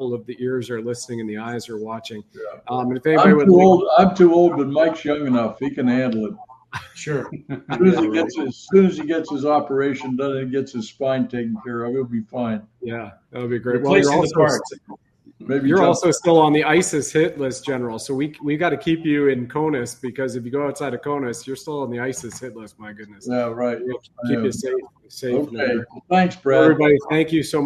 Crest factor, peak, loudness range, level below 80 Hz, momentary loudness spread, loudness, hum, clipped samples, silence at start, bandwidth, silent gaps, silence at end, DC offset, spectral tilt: 18 dB; 0 dBFS; 11 LU; -58 dBFS; 17 LU; -19 LUFS; none; under 0.1%; 0 s; 13 kHz; none; 0 s; under 0.1%; -6 dB/octave